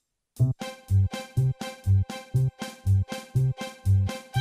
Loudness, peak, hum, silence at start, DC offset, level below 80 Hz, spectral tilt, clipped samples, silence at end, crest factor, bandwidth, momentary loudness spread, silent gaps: -27 LUFS; -12 dBFS; none; 0.4 s; under 0.1%; -46 dBFS; -6.5 dB/octave; under 0.1%; 0 s; 14 dB; 14 kHz; 5 LU; none